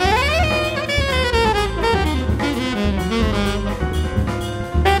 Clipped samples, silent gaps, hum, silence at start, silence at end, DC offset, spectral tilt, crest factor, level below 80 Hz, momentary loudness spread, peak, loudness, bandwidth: under 0.1%; none; none; 0 s; 0 s; under 0.1%; -5.5 dB/octave; 16 dB; -24 dBFS; 6 LU; -2 dBFS; -19 LUFS; 16 kHz